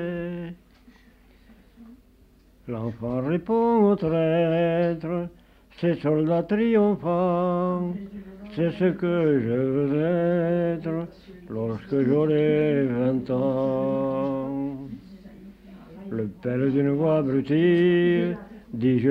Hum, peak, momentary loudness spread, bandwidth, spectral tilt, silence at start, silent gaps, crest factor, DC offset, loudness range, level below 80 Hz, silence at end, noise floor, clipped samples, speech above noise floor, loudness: none; -10 dBFS; 14 LU; 5.4 kHz; -10 dB/octave; 0 s; none; 14 dB; under 0.1%; 5 LU; -56 dBFS; 0 s; -56 dBFS; under 0.1%; 33 dB; -24 LUFS